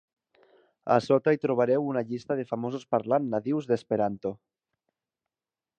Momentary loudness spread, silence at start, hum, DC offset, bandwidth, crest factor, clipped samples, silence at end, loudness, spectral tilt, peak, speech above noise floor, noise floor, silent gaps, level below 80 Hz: 10 LU; 0.85 s; none; under 0.1%; 9 kHz; 22 dB; under 0.1%; 1.45 s; -27 LUFS; -7.5 dB/octave; -6 dBFS; over 63 dB; under -90 dBFS; none; -70 dBFS